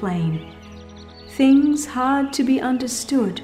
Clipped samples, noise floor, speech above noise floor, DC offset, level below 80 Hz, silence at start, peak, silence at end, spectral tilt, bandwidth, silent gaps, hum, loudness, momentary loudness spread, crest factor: under 0.1%; -40 dBFS; 21 dB; under 0.1%; -50 dBFS; 0 s; -6 dBFS; 0 s; -5 dB/octave; 15 kHz; none; none; -19 LUFS; 25 LU; 14 dB